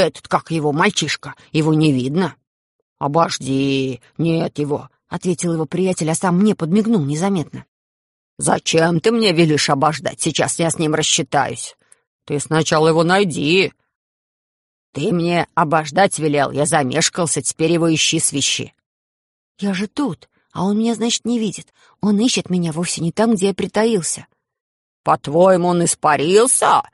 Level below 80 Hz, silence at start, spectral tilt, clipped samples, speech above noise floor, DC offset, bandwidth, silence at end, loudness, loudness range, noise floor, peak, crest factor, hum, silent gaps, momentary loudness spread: -56 dBFS; 0 s; -4 dB/octave; under 0.1%; over 73 dB; under 0.1%; 11.5 kHz; 0.1 s; -17 LUFS; 4 LU; under -90 dBFS; -2 dBFS; 16 dB; none; 2.47-2.96 s, 7.68-8.37 s, 12.07-12.19 s, 13.95-14.93 s, 18.86-19.55 s, 24.60-25.04 s; 10 LU